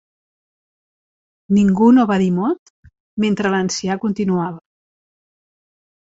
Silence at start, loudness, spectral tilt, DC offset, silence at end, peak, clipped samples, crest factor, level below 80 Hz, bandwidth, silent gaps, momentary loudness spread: 1.5 s; -17 LUFS; -6 dB/octave; under 0.1%; 1.45 s; -2 dBFS; under 0.1%; 16 dB; -54 dBFS; 8 kHz; 2.59-2.83 s, 3.00-3.17 s; 10 LU